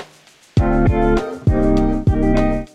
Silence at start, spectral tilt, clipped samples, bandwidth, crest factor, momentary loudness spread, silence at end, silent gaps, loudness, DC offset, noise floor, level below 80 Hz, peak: 0 s; -8.5 dB/octave; under 0.1%; 9 kHz; 12 dB; 3 LU; 0.1 s; none; -17 LUFS; under 0.1%; -48 dBFS; -22 dBFS; -4 dBFS